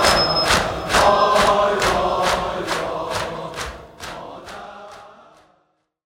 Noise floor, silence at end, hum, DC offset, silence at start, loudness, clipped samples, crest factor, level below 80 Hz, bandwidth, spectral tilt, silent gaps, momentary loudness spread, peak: -66 dBFS; 0.95 s; none; under 0.1%; 0 s; -18 LUFS; under 0.1%; 20 dB; -40 dBFS; 17 kHz; -3 dB/octave; none; 20 LU; 0 dBFS